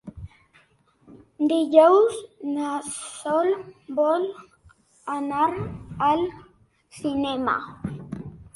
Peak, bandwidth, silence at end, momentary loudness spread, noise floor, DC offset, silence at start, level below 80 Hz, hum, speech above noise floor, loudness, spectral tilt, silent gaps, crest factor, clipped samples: -2 dBFS; 11.5 kHz; 0.05 s; 19 LU; -61 dBFS; under 0.1%; 0.05 s; -54 dBFS; none; 38 dB; -23 LUFS; -5.5 dB/octave; none; 22 dB; under 0.1%